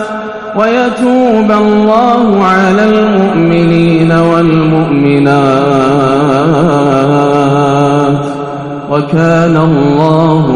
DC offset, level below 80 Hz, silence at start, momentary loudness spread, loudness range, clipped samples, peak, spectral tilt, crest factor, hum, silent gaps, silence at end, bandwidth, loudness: under 0.1%; -38 dBFS; 0 s; 5 LU; 2 LU; 2%; 0 dBFS; -7.5 dB/octave; 8 dB; none; none; 0 s; 10.5 kHz; -8 LUFS